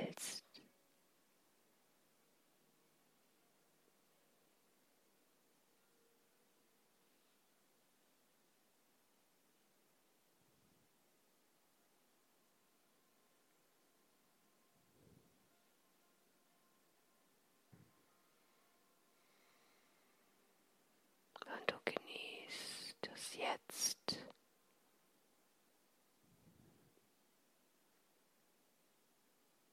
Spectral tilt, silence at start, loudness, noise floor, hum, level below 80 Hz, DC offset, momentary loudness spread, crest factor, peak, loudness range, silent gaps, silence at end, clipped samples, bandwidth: -1.5 dB/octave; 0 s; -45 LUFS; -77 dBFS; none; under -90 dBFS; under 0.1%; 18 LU; 38 dB; -18 dBFS; 10 LU; none; 3 s; under 0.1%; 16.5 kHz